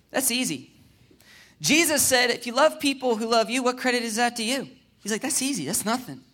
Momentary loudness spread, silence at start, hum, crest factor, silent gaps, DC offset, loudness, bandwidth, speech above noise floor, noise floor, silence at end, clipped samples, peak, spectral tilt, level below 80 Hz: 11 LU; 0.15 s; none; 18 dB; none; under 0.1%; -23 LUFS; 17.5 kHz; 32 dB; -56 dBFS; 0.15 s; under 0.1%; -8 dBFS; -2 dB/octave; -64 dBFS